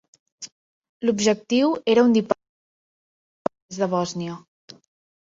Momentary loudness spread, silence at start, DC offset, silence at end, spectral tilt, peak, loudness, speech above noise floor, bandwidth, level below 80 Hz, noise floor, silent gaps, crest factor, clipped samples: 22 LU; 0.4 s; under 0.1%; 0.8 s; -5 dB/octave; -2 dBFS; -22 LUFS; over 69 dB; 7.8 kHz; -66 dBFS; under -90 dBFS; 0.52-0.82 s, 0.89-1.00 s, 2.49-3.45 s, 3.62-3.69 s; 22 dB; under 0.1%